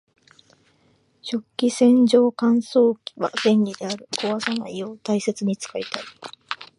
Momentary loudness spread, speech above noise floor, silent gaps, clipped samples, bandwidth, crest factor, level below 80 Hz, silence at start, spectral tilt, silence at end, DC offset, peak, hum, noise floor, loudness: 15 LU; 41 dB; none; under 0.1%; 11.5 kHz; 18 dB; -72 dBFS; 1.25 s; -5 dB/octave; 0.15 s; under 0.1%; -4 dBFS; none; -62 dBFS; -21 LUFS